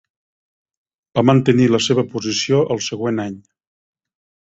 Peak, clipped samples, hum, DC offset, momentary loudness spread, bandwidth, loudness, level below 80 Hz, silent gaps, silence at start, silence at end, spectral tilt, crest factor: -2 dBFS; under 0.1%; none; under 0.1%; 10 LU; 8 kHz; -17 LUFS; -56 dBFS; none; 1.15 s; 1.1 s; -5.5 dB/octave; 18 dB